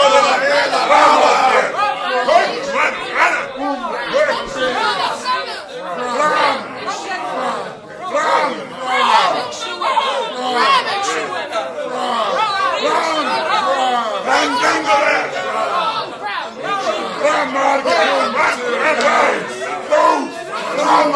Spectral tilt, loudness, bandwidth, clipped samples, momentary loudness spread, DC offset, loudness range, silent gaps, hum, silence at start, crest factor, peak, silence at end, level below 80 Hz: -2 dB/octave; -16 LUFS; 11 kHz; under 0.1%; 10 LU; under 0.1%; 4 LU; none; none; 0 s; 16 dB; 0 dBFS; 0 s; -58 dBFS